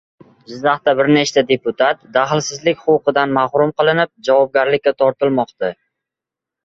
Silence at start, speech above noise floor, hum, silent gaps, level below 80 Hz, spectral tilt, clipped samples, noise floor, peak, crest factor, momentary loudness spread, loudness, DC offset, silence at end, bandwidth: 0.5 s; 70 dB; none; none; -58 dBFS; -4.5 dB/octave; under 0.1%; -86 dBFS; 0 dBFS; 16 dB; 5 LU; -16 LUFS; under 0.1%; 0.95 s; 7.8 kHz